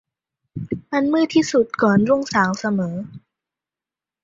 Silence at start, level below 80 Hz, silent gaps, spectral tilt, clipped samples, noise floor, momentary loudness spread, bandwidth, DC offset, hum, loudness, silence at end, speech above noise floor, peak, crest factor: 0.55 s; -56 dBFS; none; -6 dB/octave; under 0.1%; -89 dBFS; 15 LU; 7.6 kHz; under 0.1%; none; -19 LUFS; 1.05 s; 71 dB; -2 dBFS; 18 dB